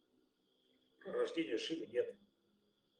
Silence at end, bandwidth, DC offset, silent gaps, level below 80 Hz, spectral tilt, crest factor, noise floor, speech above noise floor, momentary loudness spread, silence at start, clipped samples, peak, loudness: 0.85 s; 9.8 kHz; under 0.1%; none; -88 dBFS; -4 dB/octave; 18 dB; -78 dBFS; 37 dB; 7 LU; 1 s; under 0.1%; -26 dBFS; -41 LUFS